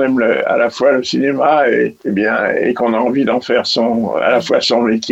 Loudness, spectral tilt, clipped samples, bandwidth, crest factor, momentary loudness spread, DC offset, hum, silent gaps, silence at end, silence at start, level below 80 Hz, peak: -14 LUFS; -4.5 dB/octave; under 0.1%; 8.2 kHz; 14 dB; 3 LU; under 0.1%; none; none; 0 s; 0 s; -58 dBFS; 0 dBFS